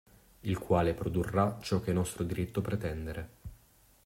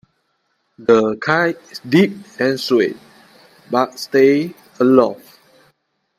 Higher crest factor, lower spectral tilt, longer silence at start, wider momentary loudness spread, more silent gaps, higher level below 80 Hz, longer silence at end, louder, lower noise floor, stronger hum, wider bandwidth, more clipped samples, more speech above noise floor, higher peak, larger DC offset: about the same, 20 dB vs 18 dB; about the same, -6.5 dB/octave vs -6 dB/octave; second, 0.45 s vs 0.8 s; first, 14 LU vs 10 LU; neither; first, -52 dBFS vs -62 dBFS; second, 0.5 s vs 1.05 s; second, -33 LUFS vs -16 LUFS; second, -63 dBFS vs -67 dBFS; neither; about the same, 16 kHz vs 15.5 kHz; neither; second, 31 dB vs 52 dB; second, -14 dBFS vs 0 dBFS; neither